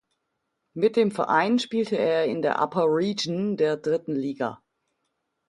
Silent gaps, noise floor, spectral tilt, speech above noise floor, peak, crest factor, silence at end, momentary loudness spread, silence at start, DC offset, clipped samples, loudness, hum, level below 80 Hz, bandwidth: none; -78 dBFS; -5.5 dB/octave; 55 dB; -8 dBFS; 18 dB; 0.95 s; 7 LU; 0.75 s; under 0.1%; under 0.1%; -24 LUFS; none; -70 dBFS; 11.5 kHz